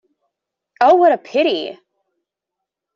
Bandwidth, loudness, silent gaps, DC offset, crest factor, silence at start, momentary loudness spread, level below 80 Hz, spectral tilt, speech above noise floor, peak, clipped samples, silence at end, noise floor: 7.4 kHz; -15 LUFS; none; under 0.1%; 18 dB; 0.8 s; 12 LU; -70 dBFS; -4.5 dB/octave; 68 dB; 0 dBFS; under 0.1%; 1.2 s; -82 dBFS